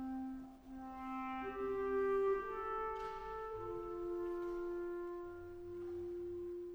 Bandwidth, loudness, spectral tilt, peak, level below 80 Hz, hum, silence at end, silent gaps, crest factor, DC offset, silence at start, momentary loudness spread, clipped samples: over 20 kHz; -42 LUFS; -7 dB/octave; -30 dBFS; -62 dBFS; none; 0 s; none; 12 dB; under 0.1%; 0 s; 13 LU; under 0.1%